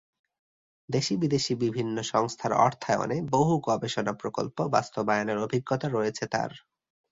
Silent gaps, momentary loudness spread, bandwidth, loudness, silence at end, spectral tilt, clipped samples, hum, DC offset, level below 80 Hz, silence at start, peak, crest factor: none; 6 LU; 8 kHz; -28 LUFS; 0.55 s; -5.5 dB/octave; under 0.1%; none; under 0.1%; -64 dBFS; 0.9 s; -6 dBFS; 22 dB